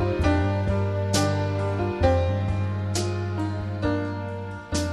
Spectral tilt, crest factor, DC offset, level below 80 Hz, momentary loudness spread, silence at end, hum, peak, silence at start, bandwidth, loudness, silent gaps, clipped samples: -6 dB/octave; 16 dB; under 0.1%; -38 dBFS; 7 LU; 0 s; none; -8 dBFS; 0 s; 13 kHz; -25 LUFS; none; under 0.1%